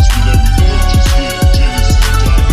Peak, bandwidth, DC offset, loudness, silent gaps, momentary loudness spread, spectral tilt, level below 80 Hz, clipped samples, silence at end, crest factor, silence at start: 0 dBFS; 15.5 kHz; under 0.1%; -11 LUFS; none; 2 LU; -5 dB/octave; -10 dBFS; under 0.1%; 0 s; 8 dB; 0 s